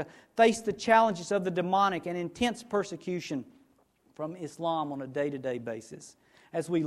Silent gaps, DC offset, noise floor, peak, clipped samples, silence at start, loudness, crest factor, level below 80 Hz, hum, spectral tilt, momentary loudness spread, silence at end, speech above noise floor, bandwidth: none; under 0.1%; -67 dBFS; -8 dBFS; under 0.1%; 0 s; -30 LUFS; 22 dB; -66 dBFS; none; -5 dB/octave; 14 LU; 0 s; 37 dB; 13.5 kHz